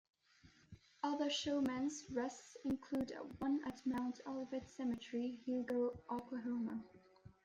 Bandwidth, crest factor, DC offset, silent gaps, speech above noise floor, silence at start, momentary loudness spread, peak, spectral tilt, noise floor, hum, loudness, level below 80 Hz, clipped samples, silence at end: 10.5 kHz; 16 dB; under 0.1%; none; 27 dB; 0.45 s; 8 LU; -28 dBFS; -4.5 dB/octave; -69 dBFS; none; -42 LUFS; -74 dBFS; under 0.1%; 0.15 s